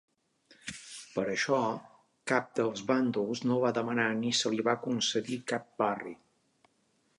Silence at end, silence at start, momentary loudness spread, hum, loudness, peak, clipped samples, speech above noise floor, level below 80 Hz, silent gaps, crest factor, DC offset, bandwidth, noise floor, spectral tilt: 1.05 s; 0.65 s; 14 LU; none; -31 LUFS; -12 dBFS; under 0.1%; 42 dB; -76 dBFS; none; 22 dB; under 0.1%; 11.5 kHz; -73 dBFS; -4 dB/octave